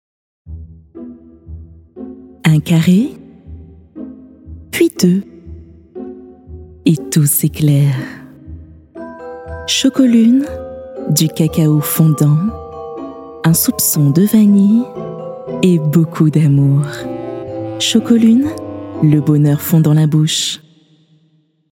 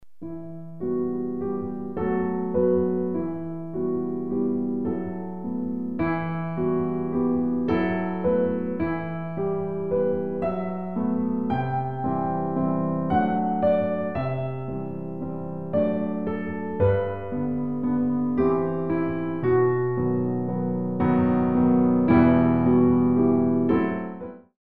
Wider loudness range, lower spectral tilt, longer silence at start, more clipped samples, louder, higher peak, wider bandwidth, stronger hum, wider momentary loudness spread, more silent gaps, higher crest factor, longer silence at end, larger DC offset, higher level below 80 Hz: about the same, 5 LU vs 7 LU; second, -5.5 dB/octave vs -11.5 dB/octave; first, 0.45 s vs 0 s; neither; first, -13 LUFS vs -25 LUFS; first, 0 dBFS vs -6 dBFS; first, 18 kHz vs 4.3 kHz; neither; first, 22 LU vs 11 LU; neither; about the same, 14 dB vs 18 dB; first, 1.15 s vs 0.05 s; second, under 0.1% vs 0.9%; about the same, -46 dBFS vs -50 dBFS